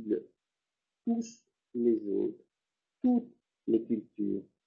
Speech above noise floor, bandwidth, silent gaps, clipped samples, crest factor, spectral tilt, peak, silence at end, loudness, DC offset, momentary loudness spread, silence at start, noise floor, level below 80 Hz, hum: 59 dB; 7.4 kHz; none; under 0.1%; 18 dB; -8 dB/octave; -16 dBFS; 0.25 s; -33 LUFS; under 0.1%; 12 LU; 0 s; -90 dBFS; -76 dBFS; none